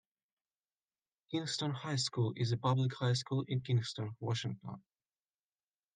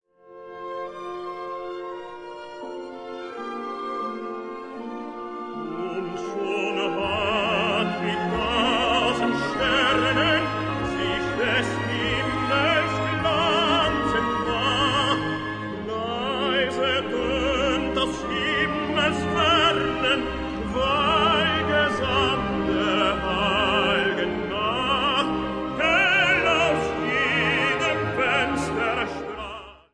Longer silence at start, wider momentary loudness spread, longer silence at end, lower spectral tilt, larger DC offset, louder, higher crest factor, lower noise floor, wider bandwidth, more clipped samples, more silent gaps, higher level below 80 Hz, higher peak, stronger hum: first, 1.3 s vs 0.25 s; second, 9 LU vs 14 LU; first, 1.15 s vs 0.15 s; about the same, -5.5 dB/octave vs -4.5 dB/octave; neither; second, -36 LUFS vs -23 LUFS; about the same, 18 dB vs 16 dB; first, under -90 dBFS vs -44 dBFS; second, 9.4 kHz vs 10.5 kHz; neither; neither; second, -76 dBFS vs -44 dBFS; second, -18 dBFS vs -8 dBFS; neither